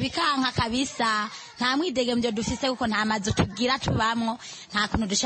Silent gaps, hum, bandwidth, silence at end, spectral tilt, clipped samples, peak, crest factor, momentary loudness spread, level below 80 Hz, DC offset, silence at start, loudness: none; none; 8.8 kHz; 0 s; -4 dB/octave; under 0.1%; -8 dBFS; 18 dB; 4 LU; -46 dBFS; under 0.1%; 0 s; -25 LUFS